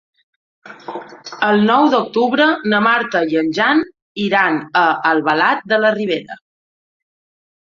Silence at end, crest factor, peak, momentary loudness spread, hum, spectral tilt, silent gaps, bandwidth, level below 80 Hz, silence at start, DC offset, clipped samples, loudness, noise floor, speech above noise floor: 1.35 s; 16 dB; 0 dBFS; 17 LU; none; -5.5 dB/octave; 4.02-4.15 s; 7.4 kHz; -64 dBFS; 0.65 s; under 0.1%; under 0.1%; -15 LUFS; under -90 dBFS; over 75 dB